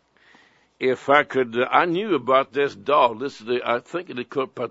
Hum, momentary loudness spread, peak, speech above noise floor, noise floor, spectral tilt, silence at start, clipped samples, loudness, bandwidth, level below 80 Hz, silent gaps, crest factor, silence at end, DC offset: none; 10 LU; 0 dBFS; 35 dB; -56 dBFS; -5.5 dB/octave; 0.8 s; under 0.1%; -22 LUFS; 8 kHz; -74 dBFS; none; 22 dB; 0 s; under 0.1%